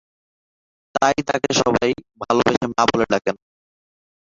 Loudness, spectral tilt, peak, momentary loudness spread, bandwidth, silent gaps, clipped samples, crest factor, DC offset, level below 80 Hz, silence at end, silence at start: -20 LUFS; -4 dB/octave; -2 dBFS; 10 LU; 7.8 kHz; 2.57-2.61 s; under 0.1%; 20 dB; under 0.1%; -50 dBFS; 1 s; 0.95 s